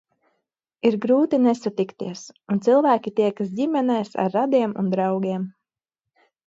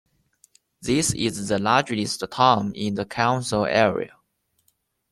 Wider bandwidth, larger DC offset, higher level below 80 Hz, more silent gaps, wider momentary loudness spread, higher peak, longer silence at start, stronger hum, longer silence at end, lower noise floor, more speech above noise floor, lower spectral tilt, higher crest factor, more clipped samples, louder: second, 7.8 kHz vs 14 kHz; neither; second, -72 dBFS vs -54 dBFS; neither; about the same, 10 LU vs 9 LU; second, -6 dBFS vs -2 dBFS; about the same, 0.85 s vs 0.8 s; neither; about the same, 0.95 s vs 1.05 s; first, -86 dBFS vs -70 dBFS; first, 65 dB vs 48 dB; first, -7 dB/octave vs -4 dB/octave; second, 16 dB vs 22 dB; neither; about the same, -22 LUFS vs -22 LUFS